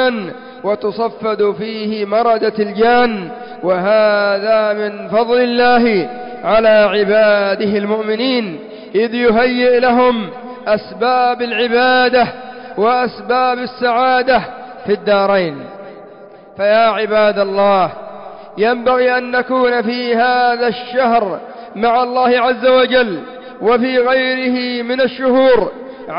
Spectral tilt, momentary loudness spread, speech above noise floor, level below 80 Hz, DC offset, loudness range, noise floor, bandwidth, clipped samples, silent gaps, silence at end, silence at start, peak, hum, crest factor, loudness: -8.5 dB/octave; 13 LU; 24 dB; -52 dBFS; under 0.1%; 3 LU; -38 dBFS; 5.4 kHz; under 0.1%; none; 0 s; 0 s; -4 dBFS; none; 10 dB; -14 LUFS